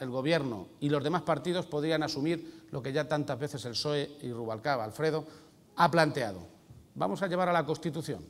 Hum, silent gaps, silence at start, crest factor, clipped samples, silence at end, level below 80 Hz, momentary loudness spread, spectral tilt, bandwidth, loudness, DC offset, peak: none; none; 0 s; 24 dB; under 0.1%; 0 s; -66 dBFS; 10 LU; -5.5 dB/octave; 16 kHz; -31 LUFS; under 0.1%; -8 dBFS